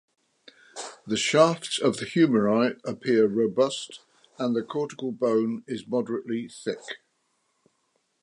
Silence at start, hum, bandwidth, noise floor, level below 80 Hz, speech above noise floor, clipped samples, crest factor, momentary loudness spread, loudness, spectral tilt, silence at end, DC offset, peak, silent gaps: 0.75 s; none; 11.5 kHz; -73 dBFS; -72 dBFS; 48 dB; under 0.1%; 20 dB; 17 LU; -25 LUFS; -5 dB/octave; 1.25 s; under 0.1%; -6 dBFS; none